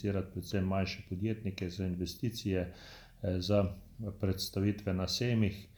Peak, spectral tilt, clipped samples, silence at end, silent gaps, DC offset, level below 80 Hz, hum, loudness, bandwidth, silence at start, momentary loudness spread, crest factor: -18 dBFS; -6 dB/octave; under 0.1%; 0.1 s; none; under 0.1%; -56 dBFS; none; -35 LUFS; over 20 kHz; 0 s; 9 LU; 16 dB